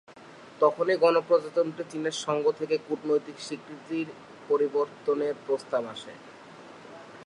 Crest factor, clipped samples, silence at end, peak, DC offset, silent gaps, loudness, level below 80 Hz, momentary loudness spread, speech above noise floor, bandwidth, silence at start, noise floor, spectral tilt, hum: 20 dB; under 0.1%; 0 s; -8 dBFS; under 0.1%; none; -28 LUFS; -80 dBFS; 23 LU; 22 dB; 11 kHz; 0.1 s; -49 dBFS; -4.5 dB/octave; none